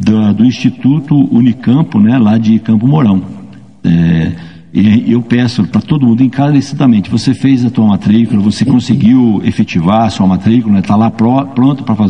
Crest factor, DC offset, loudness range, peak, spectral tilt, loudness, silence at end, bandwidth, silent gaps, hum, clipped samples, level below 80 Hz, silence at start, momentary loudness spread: 10 dB; 0.8%; 2 LU; 0 dBFS; -8 dB/octave; -10 LUFS; 0 s; 9.6 kHz; none; none; 0.5%; -44 dBFS; 0 s; 4 LU